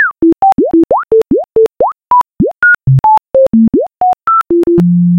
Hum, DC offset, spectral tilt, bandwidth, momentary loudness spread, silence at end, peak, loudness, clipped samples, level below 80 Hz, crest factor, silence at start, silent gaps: none; 0.2%; -9.5 dB/octave; 6.8 kHz; 4 LU; 0 s; 0 dBFS; -9 LUFS; under 0.1%; -38 dBFS; 8 dB; 0 s; none